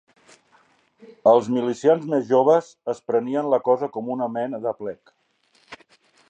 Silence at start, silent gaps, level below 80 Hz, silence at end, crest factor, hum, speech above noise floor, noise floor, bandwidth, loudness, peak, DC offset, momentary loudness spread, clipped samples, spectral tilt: 1.1 s; none; -74 dBFS; 0.55 s; 20 dB; none; 42 dB; -63 dBFS; 8.6 kHz; -22 LUFS; -4 dBFS; under 0.1%; 13 LU; under 0.1%; -7 dB/octave